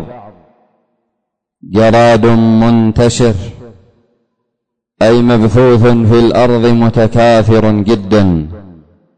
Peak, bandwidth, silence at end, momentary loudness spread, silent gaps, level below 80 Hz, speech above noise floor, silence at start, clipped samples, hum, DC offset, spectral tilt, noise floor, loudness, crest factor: -2 dBFS; 9.4 kHz; 0.45 s; 6 LU; none; -30 dBFS; 66 dB; 0 s; under 0.1%; none; under 0.1%; -7 dB/octave; -73 dBFS; -9 LUFS; 8 dB